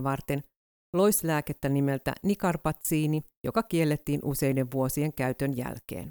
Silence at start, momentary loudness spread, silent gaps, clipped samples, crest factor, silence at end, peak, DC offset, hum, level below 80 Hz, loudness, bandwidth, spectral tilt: 0 s; 7 LU; 0.56-0.93 s, 3.37-3.44 s; under 0.1%; 16 dB; 0 s; -12 dBFS; under 0.1%; none; -52 dBFS; -29 LUFS; over 20 kHz; -6 dB/octave